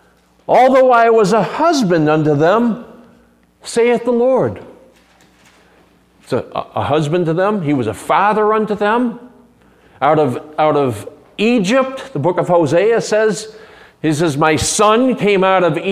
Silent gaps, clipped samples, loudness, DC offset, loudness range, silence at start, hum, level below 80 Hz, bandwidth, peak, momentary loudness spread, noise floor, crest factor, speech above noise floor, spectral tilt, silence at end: none; under 0.1%; -14 LUFS; under 0.1%; 6 LU; 0.5 s; none; -50 dBFS; 15.5 kHz; 0 dBFS; 10 LU; -51 dBFS; 14 dB; 37 dB; -5.5 dB/octave; 0 s